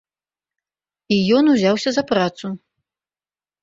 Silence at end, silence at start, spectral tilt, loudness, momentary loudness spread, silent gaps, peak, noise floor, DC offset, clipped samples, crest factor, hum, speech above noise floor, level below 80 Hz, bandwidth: 1.05 s; 1.1 s; -5.5 dB/octave; -17 LUFS; 16 LU; none; -4 dBFS; under -90 dBFS; under 0.1%; under 0.1%; 16 dB; 50 Hz at -40 dBFS; over 73 dB; -60 dBFS; 7.8 kHz